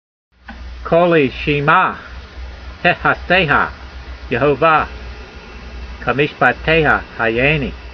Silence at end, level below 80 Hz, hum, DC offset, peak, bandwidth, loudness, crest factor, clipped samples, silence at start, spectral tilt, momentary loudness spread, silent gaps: 0 s; -34 dBFS; none; under 0.1%; 0 dBFS; 6.6 kHz; -15 LUFS; 16 dB; under 0.1%; 0.45 s; -7 dB/octave; 21 LU; none